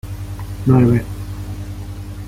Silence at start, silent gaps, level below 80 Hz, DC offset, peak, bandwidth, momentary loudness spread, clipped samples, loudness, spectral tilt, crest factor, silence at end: 0.05 s; none; -34 dBFS; under 0.1%; -2 dBFS; 15.5 kHz; 17 LU; under 0.1%; -18 LUFS; -8.5 dB/octave; 16 dB; 0 s